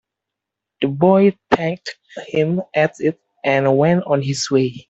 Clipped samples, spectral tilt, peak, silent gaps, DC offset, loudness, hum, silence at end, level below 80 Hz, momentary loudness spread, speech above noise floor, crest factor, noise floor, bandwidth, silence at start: under 0.1%; -6 dB/octave; -2 dBFS; none; under 0.1%; -18 LUFS; none; 0.1 s; -56 dBFS; 10 LU; 66 dB; 16 dB; -83 dBFS; 8.2 kHz; 0.8 s